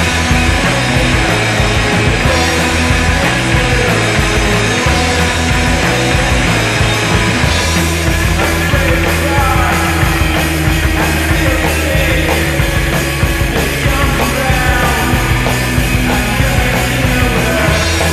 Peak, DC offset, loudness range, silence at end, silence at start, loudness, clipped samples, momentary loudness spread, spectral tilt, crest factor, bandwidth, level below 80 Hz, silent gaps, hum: 0 dBFS; under 0.1%; 1 LU; 0 s; 0 s; -12 LUFS; under 0.1%; 2 LU; -4.5 dB/octave; 12 dB; 14 kHz; -18 dBFS; none; none